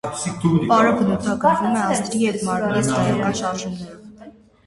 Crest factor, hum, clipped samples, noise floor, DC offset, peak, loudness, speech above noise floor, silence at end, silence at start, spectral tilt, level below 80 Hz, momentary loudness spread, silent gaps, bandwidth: 16 dB; none; under 0.1%; -44 dBFS; under 0.1%; -4 dBFS; -19 LUFS; 25 dB; 0.35 s; 0.05 s; -5.5 dB/octave; -50 dBFS; 11 LU; none; 11.5 kHz